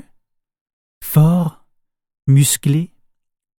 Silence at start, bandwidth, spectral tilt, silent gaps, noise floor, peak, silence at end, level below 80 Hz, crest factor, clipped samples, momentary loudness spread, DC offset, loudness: 1 s; 17.5 kHz; -5.5 dB/octave; none; -62 dBFS; -2 dBFS; 0.75 s; -48 dBFS; 16 dB; under 0.1%; 14 LU; under 0.1%; -16 LUFS